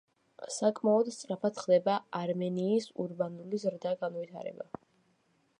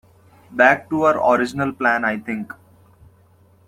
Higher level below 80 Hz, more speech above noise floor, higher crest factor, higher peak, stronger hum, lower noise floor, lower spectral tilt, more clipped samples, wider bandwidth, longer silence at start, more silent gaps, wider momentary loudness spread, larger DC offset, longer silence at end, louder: second, -82 dBFS vs -60 dBFS; first, 40 dB vs 35 dB; about the same, 18 dB vs 18 dB; second, -14 dBFS vs -2 dBFS; neither; first, -72 dBFS vs -53 dBFS; about the same, -6 dB/octave vs -6 dB/octave; neither; second, 11 kHz vs 16 kHz; about the same, 0.4 s vs 0.5 s; neither; about the same, 15 LU vs 14 LU; neither; second, 0.95 s vs 1.2 s; second, -32 LUFS vs -18 LUFS